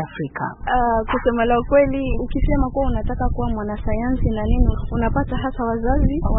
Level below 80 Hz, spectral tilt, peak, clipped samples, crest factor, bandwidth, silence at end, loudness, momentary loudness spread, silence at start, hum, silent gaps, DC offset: -24 dBFS; -12.5 dB/octave; -4 dBFS; under 0.1%; 16 dB; 3.9 kHz; 0 s; -21 LUFS; 8 LU; 0 s; none; none; under 0.1%